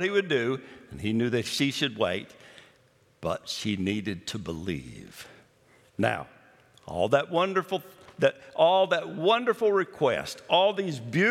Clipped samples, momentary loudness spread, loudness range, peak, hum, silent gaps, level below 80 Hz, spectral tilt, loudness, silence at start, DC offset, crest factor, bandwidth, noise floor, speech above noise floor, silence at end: under 0.1%; 14 LU; 9 LU; -8 dBFS; none; none; -64 dBFS; -5 dB/octave; -27 LUFS; 0 s; under 0.1%; 20 dB; 15.5 kHz; -63 dBFS; 36 dB; 0 s